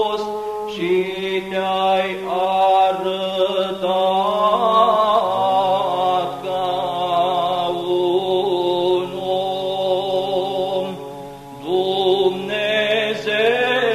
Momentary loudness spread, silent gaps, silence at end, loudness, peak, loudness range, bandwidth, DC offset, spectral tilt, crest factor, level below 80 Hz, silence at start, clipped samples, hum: 8 LU; none; 0 s; -19 LUFS; -4 dBFS; 4 LU; 14 kHz; under 0.1%; -5 dB/octave; 16 dB; -58 dBFS; 0 s; under 0.1%; none